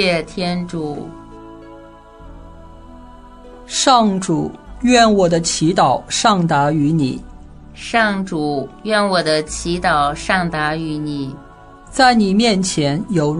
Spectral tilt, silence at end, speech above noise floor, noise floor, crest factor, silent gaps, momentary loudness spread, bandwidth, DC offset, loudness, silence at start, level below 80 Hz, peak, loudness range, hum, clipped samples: -4.5 dB/octave; 0 s; 24 dB; -40 dBFS; 18 dB; none; 15 LU; 11 kHz; under 0.1%; -16 LUFS; 0 s; -40 dBFS; 0 dBFS; 7 LU; none; under 0.1%